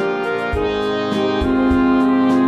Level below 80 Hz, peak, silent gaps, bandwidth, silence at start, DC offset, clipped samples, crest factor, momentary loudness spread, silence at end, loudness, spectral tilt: -32 dBFS; -6 dBFS; none; 8.2 kHz; 0 s; 0.1%; under 0.1%; 12 dB; 5 LU; 0 s; -17 LUFS; -7 dB/octave